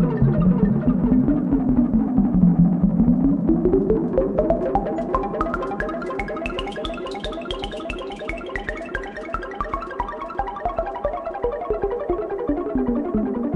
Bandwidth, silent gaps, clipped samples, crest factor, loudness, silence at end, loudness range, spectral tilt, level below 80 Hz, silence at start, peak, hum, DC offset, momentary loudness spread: 8.2 kHz; none; under 0.1%; 16 dB; -22 LUFS; 0 s; 10 LU; -9 dB/octave; -34 dBFS; 0 s; -4 dBFS; none; under 0.1%; 11 LU